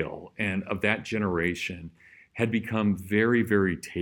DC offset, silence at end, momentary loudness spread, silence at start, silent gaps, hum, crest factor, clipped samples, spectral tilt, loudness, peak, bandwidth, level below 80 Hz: under 0.1%; 0 s; 11 LU; 0 s; none; none; 20 dB; under 0.1%; -6.5 dB/octave; -27 LUFS; -8 dBFS; 17.5 kHz; -56 dBFS